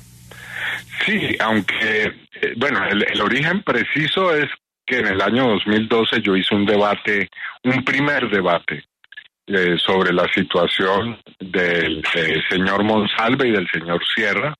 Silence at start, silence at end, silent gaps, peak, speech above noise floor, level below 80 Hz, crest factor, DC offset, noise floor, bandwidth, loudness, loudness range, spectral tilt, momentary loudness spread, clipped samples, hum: 0.3 s; 0.05 s; none; -4 dBFS; 25 dB; -54 dBFS; 14 dB; under 0.1%; -43 dBFS; 13.5 kHz; -18 LUFS; 2 LU; -5.5 dB/octave; 8 LU; under 0.1%; none